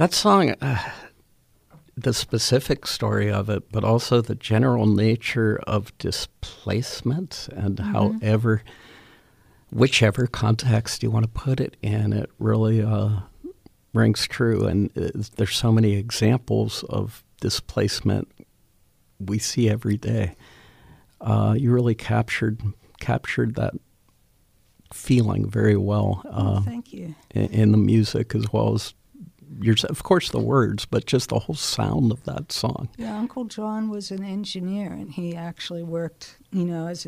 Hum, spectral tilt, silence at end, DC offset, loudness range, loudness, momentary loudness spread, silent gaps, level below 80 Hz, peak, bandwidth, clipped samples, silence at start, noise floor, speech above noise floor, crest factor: none; -6 dB/octave; 0.05 s; under 0.1%; 5 LU; -23 LUFS; 12 LU; none; -48 dBFS; -2 dBFS; 15 kHz; under 0.1%; 0 s; -60 dBFS; 38 dB; 20 dB